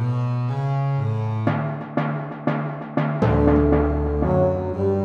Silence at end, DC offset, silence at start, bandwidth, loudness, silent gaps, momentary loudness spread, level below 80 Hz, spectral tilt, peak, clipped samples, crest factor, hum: 0 s; under 0.1%; 0 s; 6.4 kHz; -22 LUFS; none; 8 LU; -32 dBFS; -10 dB/octave; -4 dBFS; under 0.1%; 18 dB; none